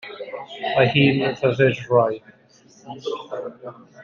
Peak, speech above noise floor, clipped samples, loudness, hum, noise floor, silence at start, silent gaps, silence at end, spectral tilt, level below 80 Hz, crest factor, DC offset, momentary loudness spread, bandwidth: -2 dBFS; 32 dB; under 0.1%; -20 LUFS; none; -53 dBFS; 0.05 s; none; 0 s; -7 dB/octave; -60 dBFS; 20 dB; under 0.1%; 18 LU; 7.2 kHz